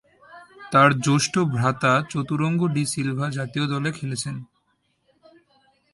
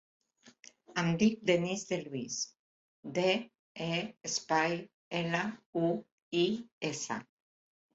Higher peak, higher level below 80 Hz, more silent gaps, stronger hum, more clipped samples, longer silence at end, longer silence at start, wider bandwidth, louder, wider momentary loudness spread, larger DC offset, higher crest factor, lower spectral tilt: first, -2 dBFS vs -14 dBFS; first, -60 dBFS vs -72 dBFS; second, none vs 2.59-3.03 s, 3.59-3.75 s, 4.94-5.11 s, 5.66-5.73 s, 6.12-6.31 s, 6.72-6.81 s; neither; neither; first, 1.5 s vs 0.7 s; second, 0.3 s vs 0.45 s; first, 11.5 kHz vs 8 kHz; first, -22 LUFS vs -34 LUFS; about the same, 11 LU vs 10 LU; neither; about the same, 22 dB vs 20 dB; about the same, -5 dB/octave vs -4.5 dB/octave